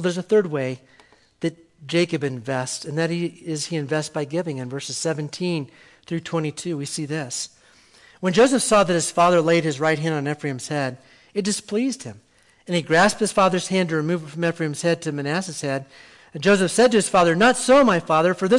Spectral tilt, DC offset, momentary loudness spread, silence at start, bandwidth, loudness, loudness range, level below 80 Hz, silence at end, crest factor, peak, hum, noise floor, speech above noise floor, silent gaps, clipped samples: -4.5 dB/octave; under 0.1%; 13 LU; 0 s; 12 kHz; -21 LUFS; 7 LU; -58 dBFS; 0 s; 14 dB; -6 dBFS; none; -53 dBFS; 32 dB; none; under 0.1%